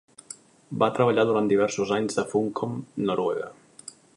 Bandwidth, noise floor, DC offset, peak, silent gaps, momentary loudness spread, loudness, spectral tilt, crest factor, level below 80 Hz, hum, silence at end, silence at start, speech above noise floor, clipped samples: 11.5 kHz; -48 dBFS; under 0.1%; -6 dBFS; none; 21 LU; -25 LUFS; -5.5 dB/octave; 20 dB; -66 dBFS; none; 0.25 s; 0.3 s; 23 dB; under 0.1%